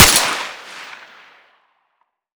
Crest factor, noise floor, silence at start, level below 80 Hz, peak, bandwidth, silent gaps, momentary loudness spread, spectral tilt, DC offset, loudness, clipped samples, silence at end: 20 dB; -68 dBFS; 0 s; -38 dBFS; 0 dBFS; over 20 kHz; none; 24 LU; -1 dB/octave; under 0.1%; -15 LUFS; 0.2%; 1.4 s